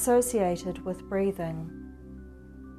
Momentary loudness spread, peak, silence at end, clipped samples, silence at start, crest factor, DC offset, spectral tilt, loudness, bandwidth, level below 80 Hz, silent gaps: 22 LU; -14 dBFS; 0 s; under 0.1%; 0 s; 16 dB; under 0.1%; -5.5 dB/octave; -29 LUFS; 14 kHz; -50 dBFS; none